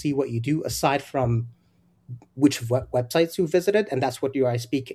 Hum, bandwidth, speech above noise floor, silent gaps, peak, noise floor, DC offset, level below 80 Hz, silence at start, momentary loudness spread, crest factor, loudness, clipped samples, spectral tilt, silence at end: none; 14.5 kHz; 38 dB; none; -6 dBFS; -62 dBFS; under 0.1%; -52 dBFS; 0 s; 7 LU; 18 dB; -24 LUFS; under 0.1%; -6 dB/octave; 0 s